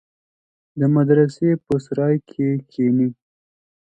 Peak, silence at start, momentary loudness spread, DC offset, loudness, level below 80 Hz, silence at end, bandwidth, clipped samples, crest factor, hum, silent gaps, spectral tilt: -4 dBFS; 0.75 s; 7 LU; under 0.1%; -19 LUFS; -60 dBFS; 0.75 s; 8.8 kHz; under 0.1%; 16 dB; none; none; -9.5 dB/octave